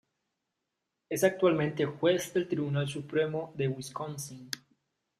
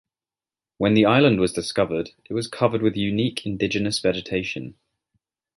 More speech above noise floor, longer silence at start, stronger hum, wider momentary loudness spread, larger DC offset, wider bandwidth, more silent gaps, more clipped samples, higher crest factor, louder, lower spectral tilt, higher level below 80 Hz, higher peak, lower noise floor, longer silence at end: second, 55 dB vs over 68 dB; first, 1.1 s vs 0.8 s; neither; about the same, 12 LU vs 12 LU; neither; first, 15.5 kHz vs 11.5 kHz; neither; neither; about the same, 22 dB vs 20 dB; second, -31 LUFS vs -22 LUFS; about the same, -5.5 dB/octave vs -5.5 dB/octave; second, -72 dBFS vs -52 dBFS; second, -10 dBFS vs -4 dBFS; second, -85 dBFS vs under -90 dBFS; second, 0.65 s vs 0.85 s